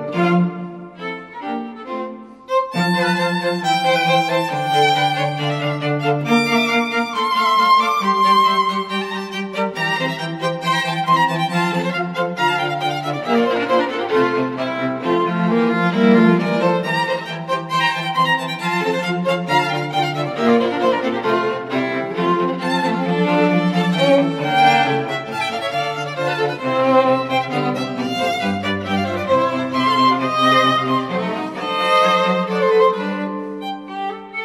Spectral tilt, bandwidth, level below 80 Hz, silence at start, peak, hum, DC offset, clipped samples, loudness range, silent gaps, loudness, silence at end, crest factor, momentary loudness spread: -5.5 dB/octave; 15 kHz; -64 dBFS; 0 s; -2 dBFS; none; under 0.1%; under 0.1%; 3 LU; none; -18 LUFS; 0 s; 16 dB; 9 LU